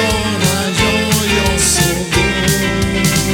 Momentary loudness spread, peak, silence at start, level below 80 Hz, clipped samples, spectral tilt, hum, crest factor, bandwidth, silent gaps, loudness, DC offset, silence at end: 3 LU; 0 dBFS; 0 s; -26 dBFS; under 0.1%; -3.5 dB/octave; none; 14 dB; 19.5 kHz; none; -13 LUFS; under 0.1%; 0 s